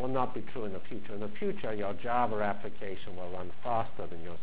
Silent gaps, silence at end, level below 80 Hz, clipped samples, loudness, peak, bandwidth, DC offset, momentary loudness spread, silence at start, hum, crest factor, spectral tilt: none; 0 s; -58 dBFS; under 0.1%; -36 LUFS; -16 dBFS; 4 kHz; 4%; 11 LU; 0 s; none; 20 dB; -9.5 dB/octave